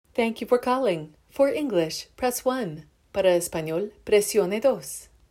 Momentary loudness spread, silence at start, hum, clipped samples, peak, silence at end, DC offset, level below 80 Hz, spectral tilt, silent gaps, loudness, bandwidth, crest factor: 11 LU; 0.15 s; none; under 0.1%; -8 dBFS; 0.25 s; under 0.1%; -58 dBFS; -4 dB/octave; none; -25 LUFS; 16 kHz; 16 dB